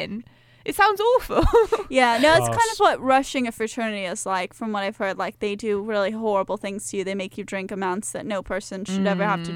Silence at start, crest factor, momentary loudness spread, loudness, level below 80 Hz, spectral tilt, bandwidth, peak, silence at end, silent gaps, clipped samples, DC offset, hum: 0 s; 18 dB; 12 LU; -23 LUFS; -38 dBFS; -4.5 dB/octave; 17 kHz; -6 dBFS; 0 s; none; under 0.1%; under 0.1%; none